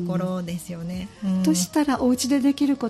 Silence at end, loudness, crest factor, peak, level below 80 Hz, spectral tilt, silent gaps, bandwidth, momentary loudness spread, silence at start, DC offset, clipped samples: 0 s; -23 LUFS; 14 dB; -10 dBFS; -54 dBFS; -5 dB/octave; none; 14.5 kHz; 11 LU; 0 s; under 0.1%; under 0.1%